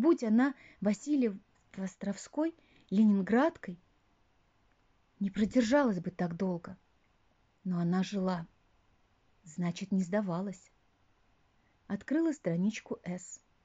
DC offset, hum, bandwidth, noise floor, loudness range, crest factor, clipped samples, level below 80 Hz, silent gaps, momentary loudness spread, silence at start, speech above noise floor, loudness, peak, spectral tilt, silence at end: under 0.1%; none; 8 kHz; -71 dBFS; 6 LU; 18 dB; under 0.1%; -68 dBFS; none; 17 LU; 0 s; 39 dB; -33 LUFS; -16 dBFS; -7 dB/octave; 0.3 s